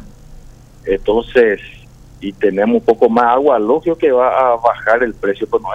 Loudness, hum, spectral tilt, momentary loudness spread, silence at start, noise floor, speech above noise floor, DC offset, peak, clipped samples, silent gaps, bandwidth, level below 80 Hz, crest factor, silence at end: -14 LUFS; none; -7 dB/octave; 8 LU; 0 s; -38 dBFS; 25 dB; under 0.1%; 0 dBFS; under 0.1%; none; 7.8 kHz; -40 dBFS; 14 dB; 0 s